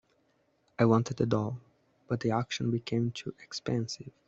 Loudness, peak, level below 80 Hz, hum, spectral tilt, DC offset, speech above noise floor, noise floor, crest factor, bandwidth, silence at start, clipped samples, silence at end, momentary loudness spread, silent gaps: -31 LUFS; -12 dBFS; -66 dBFS; none; -6.5 dB/octave; under 0.1%; 41 dB; -71 dBFS; 20 dB; 7.8 kHz; 0.8 s; under 0.1%; 0.2 s; 13 LU; none